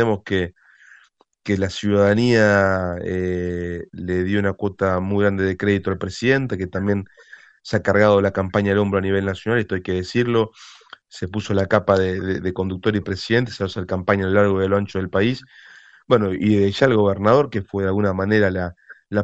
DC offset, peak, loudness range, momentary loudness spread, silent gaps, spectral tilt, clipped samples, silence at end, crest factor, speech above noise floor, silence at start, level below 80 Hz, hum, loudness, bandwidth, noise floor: under 0.1%; 0 dBFS; 3 LU; 10 LU; none; -7 dB/octave; under 0.1%; 0 s; 20 dB; 36 dB; 0 s; -50 dBFS; none; -20 LUFS; 8.2 kHz; -56 dBFS